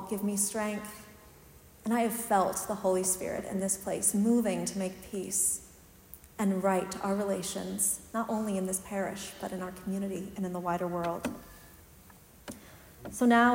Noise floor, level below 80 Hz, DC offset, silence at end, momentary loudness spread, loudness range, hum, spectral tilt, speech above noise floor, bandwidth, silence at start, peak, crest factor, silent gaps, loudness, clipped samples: -55 dBFS; -62 dBFS; under 0.1%; 0 s; 18 LU; 7 LU; none; -4 dB/octave; 25 dB; 16.5 kHz; 0 s; -12 dBFS; 20 dB; none; -31 LUFS; under 0.1%